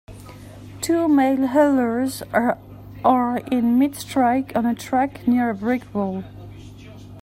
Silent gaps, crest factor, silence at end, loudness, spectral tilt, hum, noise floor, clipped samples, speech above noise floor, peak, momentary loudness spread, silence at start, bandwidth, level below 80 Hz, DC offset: none; 18 dB; 0 s; -20 LUFS; -5.5 dB/octave; none; -40 dBFS; under 0.1%; 21 dB; -2 dBFS; 23 LU; 0.1 s; 16 kHz; -52 dBFS; under 0.1%